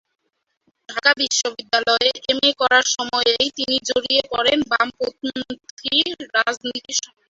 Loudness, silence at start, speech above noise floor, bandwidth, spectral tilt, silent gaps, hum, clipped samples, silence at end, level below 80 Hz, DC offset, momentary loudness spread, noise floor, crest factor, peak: -19 LUFS; 0.9 s; 50 dB; 8 kHz; -0.5 dB/octave; 5.71-5.77 s; none; under 0.1%; 0.25 s; -58 dBFS; under 0.1%; 11 LU; -70 dBFS; 20 dB; 0 dBFS